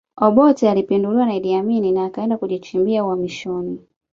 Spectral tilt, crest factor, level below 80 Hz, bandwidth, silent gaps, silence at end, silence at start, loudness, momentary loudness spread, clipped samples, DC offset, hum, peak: -7.5 dB/octave; 16 dB; -58 dBFS; 7.6 kHz; none; 0.35 s; 0.15 s; -18 LUFS; 12 LU; under 0.1%; under 0.1%; none; -2 dBFS